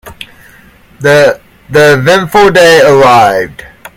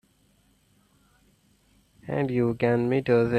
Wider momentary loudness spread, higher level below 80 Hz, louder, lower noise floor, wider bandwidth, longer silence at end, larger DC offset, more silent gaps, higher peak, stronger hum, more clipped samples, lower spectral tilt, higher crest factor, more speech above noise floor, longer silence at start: about the same, 11 LU vs 10 LU; first, -38 dBFS vs -58 dBFS; first, -6 LUFS vs -25 LUFS; second, -39 dBFS vs -64 dBFS; first, 18 kHz vs 9.6 kHz; about the same, 0.1 s vs 0 s; neither; neither; first, 0 dBFS vs -8 dBFS; second, none vs 50 Hz at -65 dBFS; first, 4% vs under 0.1%; second, -4.5 dB/octave vs -9 dB/octave; second, 8 dB vs 18 dB; second, 34 dB vs 41 dB; second, 0.05 s vs 2.05 s